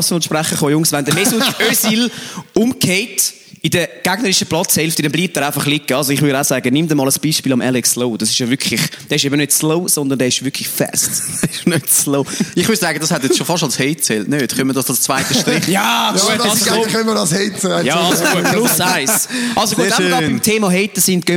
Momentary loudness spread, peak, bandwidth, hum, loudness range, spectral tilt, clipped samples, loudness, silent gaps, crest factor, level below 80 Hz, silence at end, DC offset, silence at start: 4 LU; 0 dBFS; over 20 kHz; none; 2 LU; -3 dB/octave; under 0.1%; -14 LUFS; none; 14 dB; -54 dBFS; 0 s; under 0.1%; 0 s